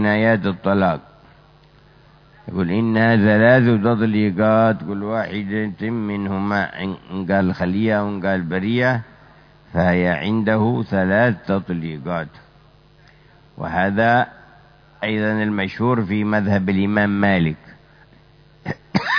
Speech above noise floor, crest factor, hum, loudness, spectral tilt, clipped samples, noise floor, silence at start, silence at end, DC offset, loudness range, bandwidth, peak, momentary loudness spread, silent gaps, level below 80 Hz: 32 dB; 20 dB; none; -19 LUFS; -8.5 dB/octave; under 0.1%; -50 dBFS; 0 s; 0 s; under 0.1%; 6 LU; 5.4 kHz; 0 dBFS; 11 LU; none; -52 dBFS